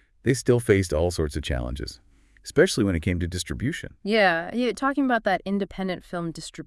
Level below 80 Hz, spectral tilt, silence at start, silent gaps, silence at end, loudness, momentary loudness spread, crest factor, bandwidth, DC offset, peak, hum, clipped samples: -42 dBFS; -5.5 dB/octave; 0.25 s; none; 0 s; -25 LUFS; 12 LU; 20 dB; 12 kHz; under 0.1%; -4 dBFS; none; under 0.1%